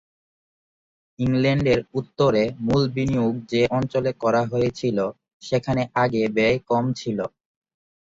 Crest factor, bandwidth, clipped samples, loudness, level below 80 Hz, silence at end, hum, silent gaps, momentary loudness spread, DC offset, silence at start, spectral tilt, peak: 16 dB; 7.8 kHz; under 0.1%; -22 LUFS; -50 dBFS; 0.8 s; none; 5.33-5.40 s; 7 LU; under 0.1%; 1.2 s; -7 dB/octave; -6 dBFS